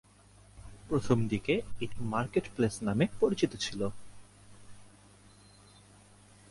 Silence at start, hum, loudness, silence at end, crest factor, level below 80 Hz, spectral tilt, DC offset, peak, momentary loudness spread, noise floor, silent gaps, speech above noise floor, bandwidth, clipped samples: 0.55 s; 50 Hz at -50 dBFS; -32 LUFS; 1.65 s; 22 dB; -56 dBFS; -6 dB/octave; under 0.1%; -12 dBFS; 11 LU; -58 dBFS; none; 28 dB; 11.5 kHz; under 0.1%